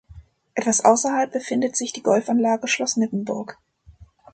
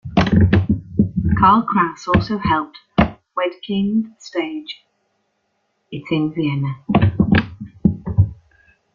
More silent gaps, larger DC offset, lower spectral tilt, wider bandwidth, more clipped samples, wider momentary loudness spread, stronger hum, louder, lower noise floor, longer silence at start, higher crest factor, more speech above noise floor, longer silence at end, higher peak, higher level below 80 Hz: neither; neither; second, -3.5 dB/octave vs -8 dB/octave; first, 9.2 kHz vs 7.2 kHz; neither; about the same, 12 LU vs 11 LU; neither; second, -21 LUFS vs -18 LUFS; second, -50 dBFS vs -69 dBFS; about the same, 0.1 s vs 0.05 s; about the same, 20 dB vs 18 dB; second, 29 dB vs 50 dB; second, 0.3 s vs 0.6 s; about the same, -2 dBFS vs -2 dBFS; second, -56 dBFS vs -36 dBFS